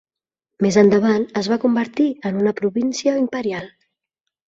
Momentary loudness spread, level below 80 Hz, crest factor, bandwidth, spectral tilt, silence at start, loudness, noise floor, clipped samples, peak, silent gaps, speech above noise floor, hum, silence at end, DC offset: 8 LU; -60 dBFS; 18 dB; 7.8 kHz; -6 dB/octave; 0.6 s; -19 LUFS; -84 dBFS; under 0.1%; -2 dBFS; none; 66 dB; none; 0.8 s; under 0.1%